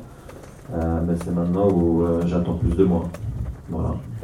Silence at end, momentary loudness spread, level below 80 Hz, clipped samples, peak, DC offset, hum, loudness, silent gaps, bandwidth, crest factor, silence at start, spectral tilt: 0 s; 15 LU; -34 dBFS; under 0.1%; -6 dBFS; under 0.1%; none; -23 LUFS; none; 11.5 kHz; 16 dB; 0 s; -9.5 dB/octave